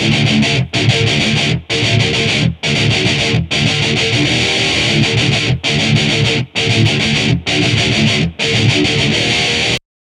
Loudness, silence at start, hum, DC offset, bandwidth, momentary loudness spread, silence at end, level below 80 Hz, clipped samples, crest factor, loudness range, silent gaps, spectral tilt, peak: -12 LUFS; 0 s; none; under 0.1%; 12 kHz; 2 LU; 0.3 s; -34 dBFS; under 0.1%; 14 dB; 1 LU; none; -4 dB/octave; 0 dBFS